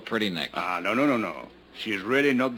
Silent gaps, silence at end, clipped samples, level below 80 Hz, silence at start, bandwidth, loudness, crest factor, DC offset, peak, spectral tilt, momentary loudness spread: none; 0 s; under 0.1%; -64 dBFS; 0 s; 19 kHz; -26 LUFS; 16 dB; under 0.1%; -10 dBFS; -5 dB/octave; 13 LU